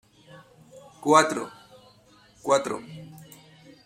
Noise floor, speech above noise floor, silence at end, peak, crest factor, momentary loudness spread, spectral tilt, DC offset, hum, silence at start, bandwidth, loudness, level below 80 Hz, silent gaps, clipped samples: -57 dBFS; 34 dB; 0.65 s; -2 dBFS; 26 dB; 25 LU; -3.5 dB/octave; under 0.1%; none; 0.75 s; 16 kHz; -24 LUFS; -70 dBFS; none; under 0.1%